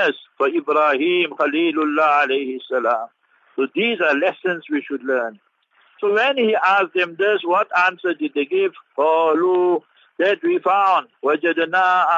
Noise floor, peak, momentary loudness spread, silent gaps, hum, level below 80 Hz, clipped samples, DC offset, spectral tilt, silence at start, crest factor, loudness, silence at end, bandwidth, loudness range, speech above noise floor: -58 dBFS; -6 dBFS; 8 LU; none; none; -82 dBFS; under 0.1%; under 0.1%; -5 dB/octave; 0 s; 14 dB; -19 LUFS; 0 s; 7.4 kHz; 3 LU; 39 dB